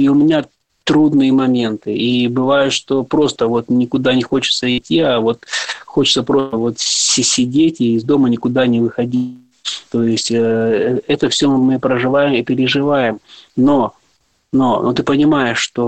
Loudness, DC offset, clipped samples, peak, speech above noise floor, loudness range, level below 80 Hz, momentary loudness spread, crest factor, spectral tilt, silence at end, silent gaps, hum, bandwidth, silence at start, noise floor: -15 LUFS; under 0.1%; under 0.1%; -4 dBFS; 45 dB; 2 LU; -52 dBFS; 7 LU; 12 dB; -4 dB/octave; 0 s; none; none; 9.2 kHz; 0 s; -60 dBFS